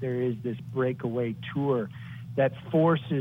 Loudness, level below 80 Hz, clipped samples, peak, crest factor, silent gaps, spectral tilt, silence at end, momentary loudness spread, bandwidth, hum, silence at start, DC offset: -28 LUFS; -64 dBFS; under 0.1%; -12 dBFS; 16 dB; none; -9.5 dB/octave; 0 s; 10 LU; 16 kHz; none; 0 s; under 0.1%